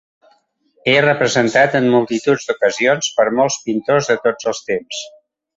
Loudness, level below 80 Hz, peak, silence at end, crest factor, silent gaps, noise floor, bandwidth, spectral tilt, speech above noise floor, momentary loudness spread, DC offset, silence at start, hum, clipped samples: -16 LUFS; -58 dBFS; 0 dBFS; 0.5 s; 16 dB; none; -59 dBFS; 8 kHz; -4 dB/octave; 43 dB; 9 LU; under 0.1%; 0.85 s; none; under 0.1%